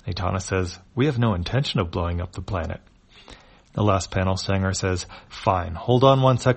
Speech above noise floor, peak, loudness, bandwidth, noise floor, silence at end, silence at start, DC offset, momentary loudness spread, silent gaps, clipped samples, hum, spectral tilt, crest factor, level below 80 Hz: 26 dB; -4 dBFS; -23 LUFS; 8.8 kHz; -48 dBFS; 0 s; 0.05 s; under 0.1%; 12 LU; none; under 0.1%; none; -6 dB/octave; 20 dB; -42 dBFS